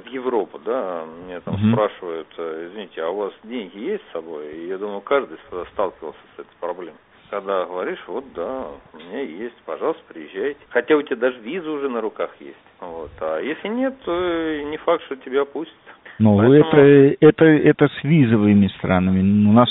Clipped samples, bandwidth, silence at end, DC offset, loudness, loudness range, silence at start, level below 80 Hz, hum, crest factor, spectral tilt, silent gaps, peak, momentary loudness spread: under 0.1%; 4 kHz; 0 s; under 0.1%; -19 LUFS; 14 LU; 0.05 s; -56 dBFS; none; 20 dB; -6.5 dB/octave; none; 0 dBFS; 19 LU